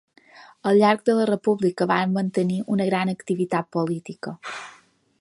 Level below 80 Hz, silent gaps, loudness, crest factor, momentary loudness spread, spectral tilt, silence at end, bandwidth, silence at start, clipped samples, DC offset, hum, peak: -70 dBFS; none; -22 LUFS; 18 dB; 16 LU; -7 dB/octave; 0.5 s; 11.5 kHz; 0.35 s; under 0.1%; under 0.1%; none; -4 dBFS